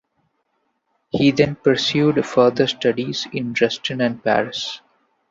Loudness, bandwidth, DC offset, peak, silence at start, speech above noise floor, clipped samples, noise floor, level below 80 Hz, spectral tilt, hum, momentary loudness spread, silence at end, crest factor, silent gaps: -19 LUFS; 7.8 kHz; under 0.1%; -2 dBFS; 1.15 s; 51 dB; under 0.1%; -70 dBFS; -56 dBFS; -5.5 dB/octave; none; 9 LU; 0.5 s; 18 dB; none